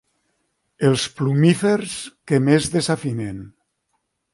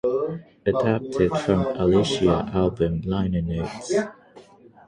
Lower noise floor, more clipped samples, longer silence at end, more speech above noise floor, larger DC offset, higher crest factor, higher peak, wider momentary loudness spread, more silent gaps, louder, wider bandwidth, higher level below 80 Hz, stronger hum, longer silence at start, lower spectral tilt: first, -73 dBFS vs -49 dBFS; neither; first, 0.85 s vs 0.45 s; first, 54 dB vs 27 dB; neither; about the same, 18 dB vs 16 dB; first, -2 dBFS vs -6 dBFS; first, 14 LU vs 8 LU; neither; first, -20 LUFS vs -23 LUFS; about the same, 11.5 kHz vs 10.5 kHz; second, -54 dBFS vs -42 dBFS; neither; first, 0.8 s vs 0.05 s; about the same, -5.5 dB/octave vs -6.5 dB/octave